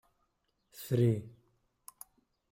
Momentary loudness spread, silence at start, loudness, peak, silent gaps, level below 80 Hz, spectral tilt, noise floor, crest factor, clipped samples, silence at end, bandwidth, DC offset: 26 LU; 0.75 s; -32 LUFS; -18 dBFS; none; -68 dBFS; -7.5 dB/octave; -79 dBFS; 20 dB; under 0.1%; 1.2 s; 16.5 kHz; under 0.1%